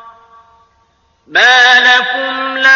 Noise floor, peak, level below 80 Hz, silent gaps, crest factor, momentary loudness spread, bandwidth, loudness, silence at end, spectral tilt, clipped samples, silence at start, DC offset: -55 dBFS; 0 dBFS; -56 dBFS; none; 12 dB; 11 LU; 7.4 kHz; -8 LUFS; 0 s; 0 dB/octave; under 0.1%; 0.05 s; under 0.1%